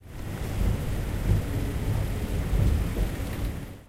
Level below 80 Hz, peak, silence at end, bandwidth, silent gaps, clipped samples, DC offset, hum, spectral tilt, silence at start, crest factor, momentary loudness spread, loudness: -30 dBFS; -12 dBFS; 0.05 s; 16 kHz; none; under 0.1%; under 0.1%; none; -6.5 dB/octave; 0.05 s; 16 dB; 7 LU; -29 LUFS